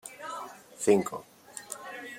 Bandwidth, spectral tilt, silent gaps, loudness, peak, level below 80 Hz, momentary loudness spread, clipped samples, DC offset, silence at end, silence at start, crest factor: 16.5 kHz; -4.5 dB/octave; none; -31 LUFS; -10 dBFS; -76 dBFS; 20 LU; under 0.1%; under 0.1%; 0 s; 0.05 s; 22 dB